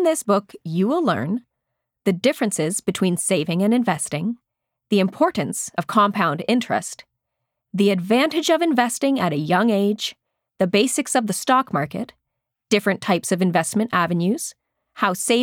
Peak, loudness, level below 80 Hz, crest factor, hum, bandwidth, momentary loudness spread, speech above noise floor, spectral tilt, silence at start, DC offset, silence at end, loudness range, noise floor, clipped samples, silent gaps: -6 dBFS; -21 LUFS; -68 dBFS; 16 dB; none; 17 kHz; 8 LU; 60 dB; -4.5 dB/octave; 0 s; under 0.1%; 0 s; 2 LU; -80 dBFS; under 0.1%; none